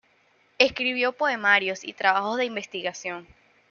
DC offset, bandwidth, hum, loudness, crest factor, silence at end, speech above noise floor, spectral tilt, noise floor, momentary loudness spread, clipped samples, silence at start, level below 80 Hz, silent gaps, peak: under 0.1%; 7.2 kHz; none; -24 LUFS; 22 dB; 0.5 s; 38 dB; -2.5 dB/octave; -63 dBFS; 12 LU; under 0.1%; 0.6 s; -66 dBFS; none; -4 dBFS